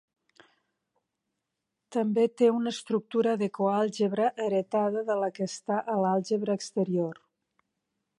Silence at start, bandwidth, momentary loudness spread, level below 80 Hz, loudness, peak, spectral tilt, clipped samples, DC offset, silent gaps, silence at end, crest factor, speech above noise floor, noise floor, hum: 1.9 s; 11 kHz; 6 LU; -78 dBFS; -28 LUFS; -12 dBFS; -6 dB/octave; under 0.1%; under 0.1%; none; 1.05 s; 18 dB; 57 dB; -84 dBFS; none